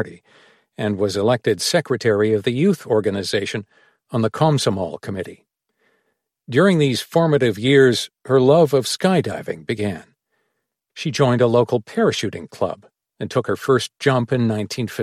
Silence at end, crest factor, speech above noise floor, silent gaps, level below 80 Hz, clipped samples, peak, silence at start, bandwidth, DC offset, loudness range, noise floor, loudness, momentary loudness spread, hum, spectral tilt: 0 s; 18 dB; 57 dB; none; -60 dBFS; under 0.1%; -2 dBFS; 0 s; 14.5 kHz; under 0.1%; 5 LU; -76 dBFS; -19 LUFS; 12 LU; none; -5.5 dB/octave